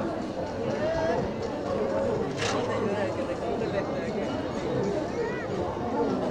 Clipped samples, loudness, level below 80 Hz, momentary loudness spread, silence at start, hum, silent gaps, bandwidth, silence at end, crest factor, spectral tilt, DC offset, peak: under 0.1%; -29 LUFS; -50 dBFS; 4 LU; 0 s; none; none; 11 kHz; 0 s; 14 dB; -6 dB/octave; under 0.1%; -14 dBFS